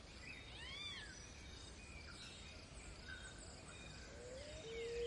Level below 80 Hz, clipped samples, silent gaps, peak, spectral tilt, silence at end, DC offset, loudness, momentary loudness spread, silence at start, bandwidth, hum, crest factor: -62 dBFS; under 0.1%; none; -36 dBFS; -3 dB/octave; 0 s; under 0.1%; -53 LUFS; 7 LU; 0 s; 11.5 kHz; none; 16 dB